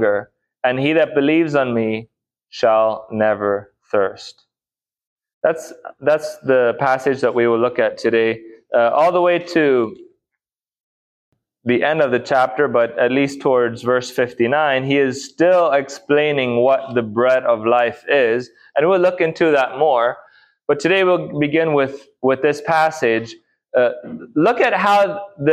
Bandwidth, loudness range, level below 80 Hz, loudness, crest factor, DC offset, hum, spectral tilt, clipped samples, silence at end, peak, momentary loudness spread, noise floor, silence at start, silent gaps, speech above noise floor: 13.5 kHz; 4 LU; -64 dBFS; -17 LUFS; 14 dB; under 0.1%; none; -5.5 dB/octave; under 0.1%; 0 s; -2 dBFS; 8 LU; under -90 dBFS; 0 s; 5.07-5.16 s, 5.33-5.41 s, 10.80-11.32 s; over 73 dB